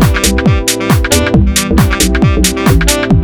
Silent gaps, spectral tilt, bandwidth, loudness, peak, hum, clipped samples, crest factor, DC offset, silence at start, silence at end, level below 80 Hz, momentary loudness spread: none; -4.5 dB/octave; over 20 kHz; -10 LUFS; 0 dBFS; none; under 0.1%; 10 dB; under 0.1%; 0 s; 0 s; -16 dBFS; 1 LU